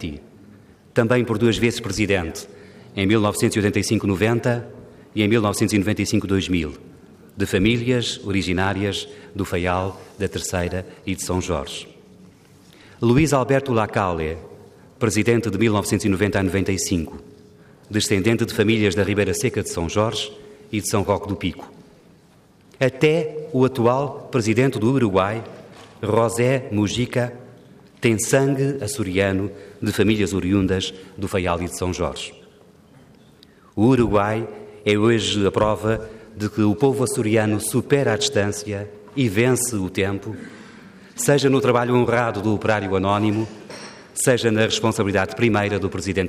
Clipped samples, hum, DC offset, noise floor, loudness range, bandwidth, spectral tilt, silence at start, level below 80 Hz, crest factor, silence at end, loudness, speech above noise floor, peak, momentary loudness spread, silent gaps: under 0.1%; none; under 0.1%; -52 dBFS; 4 LU; 15.5 kHz; -5 dB/octave; 0 s; -48 dBFS; 18 dB; 0 s; -21 LUFS; 32 dB; -4 dBFS; 12 LU; none